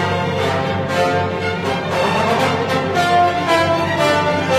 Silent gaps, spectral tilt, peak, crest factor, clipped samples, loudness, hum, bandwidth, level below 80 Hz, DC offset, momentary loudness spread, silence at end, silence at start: none; -5 dB/octave; -4 dBFS; 12 dB; under 0.1%; -17 LUFS; none; 15.5 kHz; -48 dBFS; under 0.1%; 4 LU; 0 s; 0 s